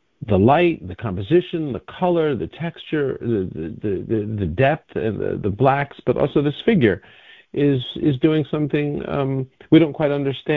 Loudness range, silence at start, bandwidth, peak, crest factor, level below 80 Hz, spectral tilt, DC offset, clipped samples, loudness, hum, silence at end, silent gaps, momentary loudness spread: 3 LU; 0.2 s; 4.5 kHz; -2 dBFS; 18 dB; -44 dBFS; -10 dB/octave; under 0.1%; under 0.1%; -20 LUFS; none; 0 s; none; 12 LU